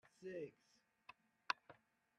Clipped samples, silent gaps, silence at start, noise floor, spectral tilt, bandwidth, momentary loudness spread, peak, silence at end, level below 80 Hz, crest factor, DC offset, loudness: under 0.1%; none; 0.2 s; -69 dBFS; -3.5 dB/octave; 11 kHz; 20 LU; -20 dBFS; 0.45 s; under -90 dBFS; 34 dB; under 0.1%; -49 LUFS